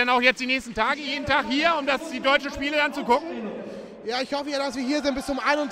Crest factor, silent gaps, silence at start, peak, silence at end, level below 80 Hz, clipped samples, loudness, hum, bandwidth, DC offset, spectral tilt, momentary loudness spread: 20 dB; none; 0 s; -4 dBFS; 0 s; -52 dBFS; under 0.1%; -24 LUFS; none; 15.5 kHz; under 0.1%; -3 dB/octave; 12 LU